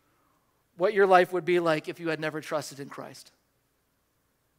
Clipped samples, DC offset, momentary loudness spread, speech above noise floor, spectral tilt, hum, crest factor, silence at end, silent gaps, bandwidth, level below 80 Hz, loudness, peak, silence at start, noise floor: under 0.1%; under 0.1%; 20 LU; 47 dB; -5.5 dB/octave; none; 22 dB; 1.35 s; none; 16 kHz; -78 dBFS; -26 LUFS; -6 dBFS; 0.8 s; -73 dBFS